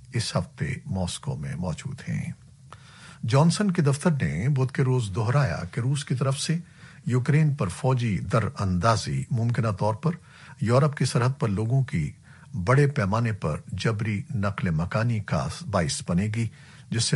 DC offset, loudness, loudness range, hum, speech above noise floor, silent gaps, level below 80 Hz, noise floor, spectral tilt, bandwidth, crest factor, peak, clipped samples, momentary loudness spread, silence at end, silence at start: under 0.1%; -26 LUFS; 3 LU; none; 24 dB; none; -50 dBFS; -48 dBFS; -6 dB/octave; 11.5 kHz; 18 dB; -6 dBFS; under 0.1%; 10 LU; 0 s; 0 s